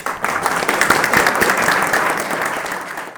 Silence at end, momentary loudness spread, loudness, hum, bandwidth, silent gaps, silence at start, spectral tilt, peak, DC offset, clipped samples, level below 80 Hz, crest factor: 0 s; 9 LU; -16 LUFS; none; over 20 kHz; none; 0 s; -2.5 dB/octave; 0 dBFS; under 0.1%; under 0.1%; -50 dBFS; 16 dB